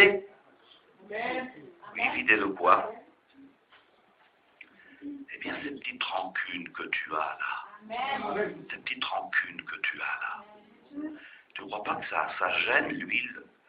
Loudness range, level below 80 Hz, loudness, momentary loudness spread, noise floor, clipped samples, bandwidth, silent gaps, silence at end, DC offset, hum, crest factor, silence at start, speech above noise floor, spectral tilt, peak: 8 LU; -72 dBFS; -30 LUFS; 18 LU; -64 dBFS; under 0.1%; 5.2 kHz; none; 0.25 s; under 0.1%; none; 28 dB; 0 s; 33 dB; -7 dB/octave; -4 dBFS